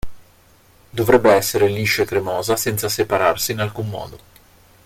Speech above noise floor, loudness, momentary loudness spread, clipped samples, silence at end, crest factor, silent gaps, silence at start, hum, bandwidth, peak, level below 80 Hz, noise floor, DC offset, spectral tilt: 34 dB; -18 LUFS; 14 LU; under 0.1%; 0.7 s; 20 dB; none; 0.05 s; none; 16.5 kHz; 0 dBFS; -44 dBFS; -52 dBFS; under 0.1%; -4 dB/octave